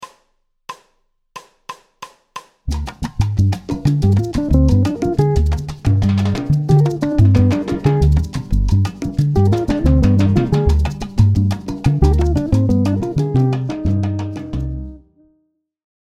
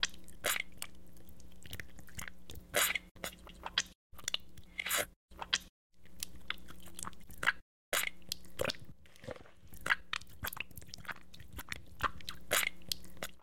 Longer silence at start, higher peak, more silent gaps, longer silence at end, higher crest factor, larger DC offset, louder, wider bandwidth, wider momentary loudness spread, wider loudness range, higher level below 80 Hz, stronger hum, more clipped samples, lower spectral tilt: about the same, 0 s vs 0 s; first, 0 dBFS vs -12 dBFS; second, none vs 3.11-3.15 s, 3.95-4.10 s, 5.16-5.28 s, 5.69-5.90 s, 7.62-7.92 s; first, 1.1 s vs 0 s; second, 16 dB vs 30 dB; second, under 0.1% vs 0.4%; first, -17 LUFS vs -38 LUFS; second, 10.5 kHz vs 17 kHz; about the same, 15 LU vs 17 LU; about the same, 6 LU vs 4 LU; first, -24 dBFS vs -60 dBFS; neither; neither; first, -8.5 dB/octave vs -1 dB/octave